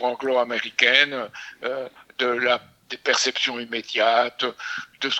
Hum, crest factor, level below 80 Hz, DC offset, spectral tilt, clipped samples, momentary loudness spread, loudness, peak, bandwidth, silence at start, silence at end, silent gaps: none; 22 dB; -74 dBFS; under 0.1%; -1 dB/octave; under 0.1%; 15 LU; -22 LUFS; 0 dBFS; 15.5 kHz; 0 s; 0 s; none